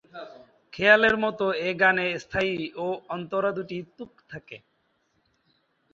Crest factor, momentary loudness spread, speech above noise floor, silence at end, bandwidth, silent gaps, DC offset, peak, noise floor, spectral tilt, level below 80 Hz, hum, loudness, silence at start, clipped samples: 24 dB; 25 LU; 46 dB; 1.35 s; 7.6 kHz; none; under 0.1%; -2 dBFS; -71 dBFS; -5.5 dB/octave; -60 dBFS; none; -24 LUFS; 0.15 s; under 0.1%